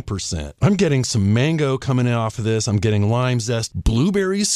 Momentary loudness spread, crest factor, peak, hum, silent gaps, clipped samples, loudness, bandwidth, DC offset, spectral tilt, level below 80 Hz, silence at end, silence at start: 4 LU; 16 dB; -4 dBFS; none; none; under 0.1%; -19 LUFS; 13 kHz; under 0.1%; -5.5 dB/octave; -34 dBFS; 0 s; 0.05 s